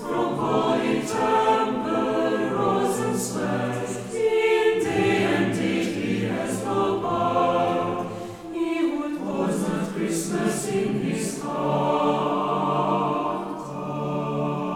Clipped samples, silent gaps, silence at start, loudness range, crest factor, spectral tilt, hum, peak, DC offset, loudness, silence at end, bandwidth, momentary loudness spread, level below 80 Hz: under 0.1%; none; 0 s; 3 LU; 16 dB; -5.5 dB/octave; none; -8 dBFS; under 0.1%; -24 LUFS; 0 s; 17 kHz; 7 LU; -58 dBFS